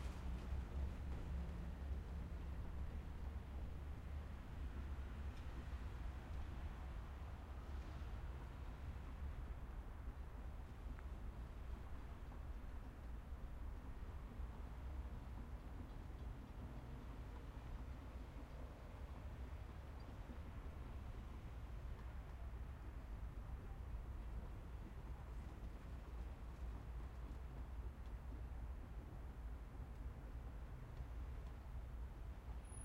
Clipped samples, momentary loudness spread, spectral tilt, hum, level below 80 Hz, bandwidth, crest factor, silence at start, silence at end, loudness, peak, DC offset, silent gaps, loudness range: under 0.1%; 5 LU; -7 dB/octave; none; -52 dBFS; 15.5 kHz; 16 dB; 0 s; 0 s; -53 LUFS; -34 dBFS; under 0.1%; none; 3 LU